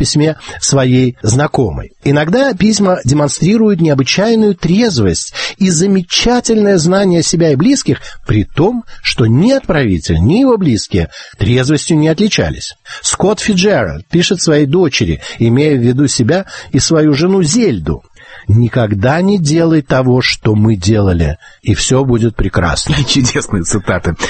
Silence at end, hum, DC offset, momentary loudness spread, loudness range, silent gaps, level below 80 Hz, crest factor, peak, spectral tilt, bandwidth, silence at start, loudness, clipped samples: 0 s; none; under 0.1%; 6 LU; 1 LU; none; -30 dBFS; 12 dB; 0 dBFS; -5 dB/octave; 8.8 kHz; 0 s; -11 LUFS; under 0.1%